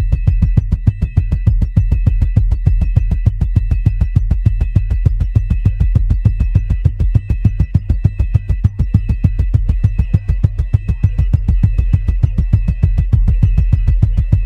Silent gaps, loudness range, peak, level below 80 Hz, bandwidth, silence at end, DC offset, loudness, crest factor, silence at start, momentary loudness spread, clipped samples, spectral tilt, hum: none; 1 LU; 0 dBFS; -16 dBFS; 3.5 kHz; 0 s; under 0.1%; -16 LUFS; 12 dB; 0 s; 3 LU; 0.2%; -10 dB/octave; none